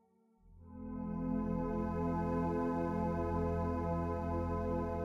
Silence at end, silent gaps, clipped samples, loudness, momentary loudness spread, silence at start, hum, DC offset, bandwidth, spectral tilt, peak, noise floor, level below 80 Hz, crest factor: 0 s; none; under 0.1%; -37 LUFS; 6 LU; 0.45 s; none; under 0.1%; 7.4 kHz; -10 dB/octave; -24 dBFS; -67 dBFS; -48 dBFS; 12 dB